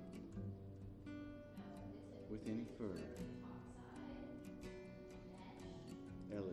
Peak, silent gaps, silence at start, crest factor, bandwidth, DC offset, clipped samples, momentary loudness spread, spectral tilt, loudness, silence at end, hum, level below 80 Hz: -34 dBFS; none; 0 s; 18 dB; 13 kHz; under 0.1%; under 0.1%; 8 LU; -7.5 dB/octave; -52 LUFS; 0 s; none; -66 dBFS